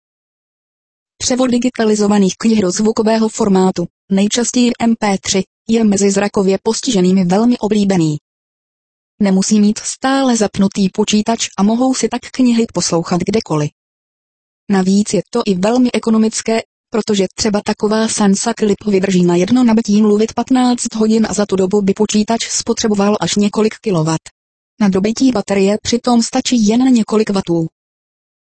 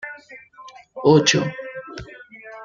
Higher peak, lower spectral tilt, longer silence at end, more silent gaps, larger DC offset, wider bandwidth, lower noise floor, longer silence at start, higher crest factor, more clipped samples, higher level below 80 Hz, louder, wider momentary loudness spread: about the same, 0 dBFS vs -2 dBFS; about the same, -5 dB/octave vs -4.5 dB/octave; first, 0.9 s vs 0 s; first, 3.90-4.08 s, 5.47-5.65 s, 8.21-9.18 s, 13.72-14.67 s, 16.65-16.84 s, 24.31-24.77 s vs none; first, 0.2% vs under 0.1%; first, 8.8 kHz vs 7.6 kHz; first, under -90 dBFS vs -41 dBFS; first, 1.2 s vs 0.05 s; second, 14 dB vs 20 dB; neither; first, -48 dBFS vs -56 dBFS; first, -14 LUFS vs -17 LUFS; second, 5 LU vs 25 LU